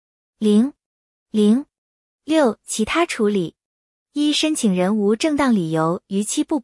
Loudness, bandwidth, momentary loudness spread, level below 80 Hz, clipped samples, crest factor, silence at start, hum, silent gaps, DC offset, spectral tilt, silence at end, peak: -19 LUFS; 12 kHz; 7 LU; -58 dBFS; under 0.1%; 16 dB; 0.4 s; none; 0.86-1.26 s, 1.78-2.19 s, 3.65-4.06 s; under 0.1%; -5 dB/octave; 0 s; -4 dBFS